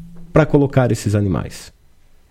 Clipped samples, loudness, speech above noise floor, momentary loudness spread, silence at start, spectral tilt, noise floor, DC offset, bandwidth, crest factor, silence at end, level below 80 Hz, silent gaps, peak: under 0.1%; -17 LUFS; 32 dB; 14 LU; 0 s; -7.5 dB/octave; -48 dBFS; under 0.1%; 15 kHz; 18 dB; 0.6 s; -36 dBFS; none; 0 dBFS